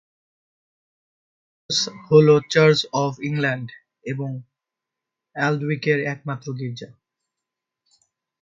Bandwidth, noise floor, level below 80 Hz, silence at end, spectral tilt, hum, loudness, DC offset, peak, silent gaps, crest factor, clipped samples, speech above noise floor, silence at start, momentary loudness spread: 7.8 kHz; -85 dBFS; -64 dBFS; 1.55 s; -5 dB/octave; none; -21 LUFS; under 0.1%; -2 dBFS; none; 22 dB; under 0.1%; 65 dB; 1.7 s; 18 LU